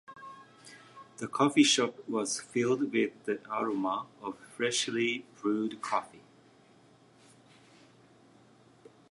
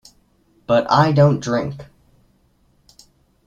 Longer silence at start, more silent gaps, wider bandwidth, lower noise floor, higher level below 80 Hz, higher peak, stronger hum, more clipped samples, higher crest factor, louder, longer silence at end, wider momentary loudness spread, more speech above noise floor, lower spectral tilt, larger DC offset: second, 0.1 s vs 0.7 s; neither; first, 11.5 kHz vs 7.8 kHz; about the same, -61 dBFS vs -59 dBFS; second, -80 dBFS vs -54 dBFS; second, -10 dBFS vs -2 dBFS; neither; neither; first, 24 dB vs 18 dB; second, -31 LUFS vs -17 LUFS; first, 2.9 s vs 1.65 s; first, 26 LU vs 21 LU; second, 30 dB vs 43 dB; second, -3 dB/octave vs -7 dB/octave; neither